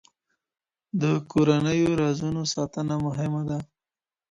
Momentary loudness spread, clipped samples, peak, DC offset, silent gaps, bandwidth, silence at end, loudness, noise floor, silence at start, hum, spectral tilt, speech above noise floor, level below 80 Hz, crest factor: 8 LU; under 0.1%; -8 dBFS; under 0.1%; none; 10.5 kHz; 0.65 s; -25 LUFS; under -90 dBFS; 0.95 s; none; -6 dB/octave; over 66 dB; -54 dBFS; 18 dB